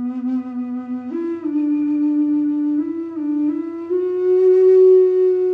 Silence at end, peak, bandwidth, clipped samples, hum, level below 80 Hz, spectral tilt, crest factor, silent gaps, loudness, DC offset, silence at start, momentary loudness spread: 0 s; -6 dBFS; 3.1 kHz; under 0.1%; none; -70 dBFS; -8.5 dB/octave; 12 dB; none; -18 LUFS; under 0.1%; 0 s; 14 LU